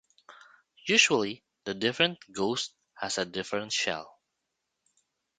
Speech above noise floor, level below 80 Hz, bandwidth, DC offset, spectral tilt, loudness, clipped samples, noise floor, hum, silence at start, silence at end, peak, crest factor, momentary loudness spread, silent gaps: 54 dB; -70 dBFS; 9.6 kHz; under 0.1%; -2 dB/octave; -28 LUFS; under 0.1%; -83 dBFS; none; 0.3 s; 1.3 s; -6 dBFS; 26 dB; 16 LU; none